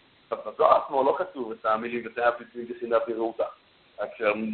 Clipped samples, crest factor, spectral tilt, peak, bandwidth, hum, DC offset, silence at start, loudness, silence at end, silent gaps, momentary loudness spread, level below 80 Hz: under 0.1%; 22 dB; -9 dB/octave; -4 dBFS; 4.5 kHz; none; under 0.1%; 0.3 s; -27 LUFS; 0 s; none; 15 LU; -68 dBFS